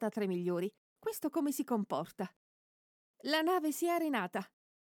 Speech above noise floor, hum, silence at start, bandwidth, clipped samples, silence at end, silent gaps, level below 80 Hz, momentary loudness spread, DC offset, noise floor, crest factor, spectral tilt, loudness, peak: over 55 dB; none; 0 s; over 20 kHz; under 0.1%; 0.35 s; 0.78-0.96 s, 2.36-3.14 s; -86 dBFS; 11 LU; under 0.1%; under -90 dBFS; 18 dB; -4.5 dB/octave; -36 LUFS; -18 dBFS